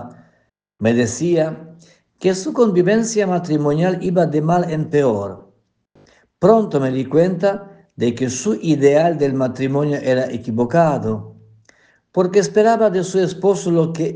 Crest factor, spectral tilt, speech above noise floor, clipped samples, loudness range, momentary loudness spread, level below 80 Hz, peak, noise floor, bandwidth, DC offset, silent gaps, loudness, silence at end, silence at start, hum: 16 dB; -6.5 dB/octave; 47 dB; under 0.1%; 2 LU; 8 LU; -58 dBFS; 0 dBFS; -63 dBFS; 10 kHz; under 0.1%; none; -17 LUFS; 0 s; 0 s; none